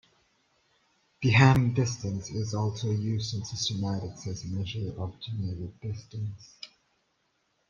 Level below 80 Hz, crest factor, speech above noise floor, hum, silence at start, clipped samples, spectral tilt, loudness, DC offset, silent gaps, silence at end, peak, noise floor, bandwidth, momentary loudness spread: -56 dBFS; 24 dB; 46 dB; none; 1.2 s; under 0.1%; -5.5 dB/octave; -29 LUFS; under 0.1%; none; 1.05 s; -6 dBFS; -74 dBFS; 7.4 kHz; 17 LU